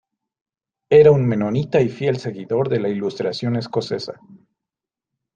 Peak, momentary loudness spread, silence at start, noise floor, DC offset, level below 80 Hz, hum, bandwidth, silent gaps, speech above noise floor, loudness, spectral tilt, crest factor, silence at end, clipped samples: -2 dBFS; 13 LU; 0.9 s; -87 dBFS; under 0.1%; -58 dBFS; none; 7.4 kHz; none; 69 dB; -19 LUFS; -7.5 dB/octave; 18 dB; 1.2 s; under 0.1%